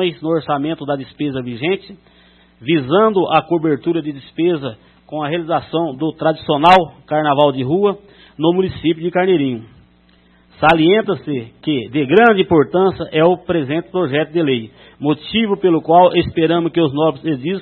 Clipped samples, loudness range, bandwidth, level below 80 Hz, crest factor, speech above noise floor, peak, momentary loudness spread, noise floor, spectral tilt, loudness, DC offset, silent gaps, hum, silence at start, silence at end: under 0.1%; 3 LU; 6.2 kHz; -50 dBFS; 16 dB; 36 dB; 0 dBFS; 12 LU; -51 dBFS; -8 dB/octave; -16 LUFS; under 0.1%; none; none; 0 s; 0 s